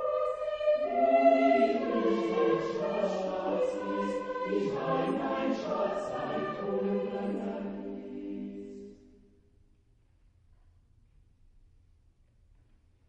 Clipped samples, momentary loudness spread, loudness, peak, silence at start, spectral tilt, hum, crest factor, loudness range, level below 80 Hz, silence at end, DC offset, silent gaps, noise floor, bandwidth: under 0.1%; 16 LU; -30 LUFS; -12 dBFS; 0 s; -7 dB/octave; none; 20 dB; 16 LU; -64 dBFS; 4.15 s; under 0.1%; none; -65 dBFS; 8.8 kHz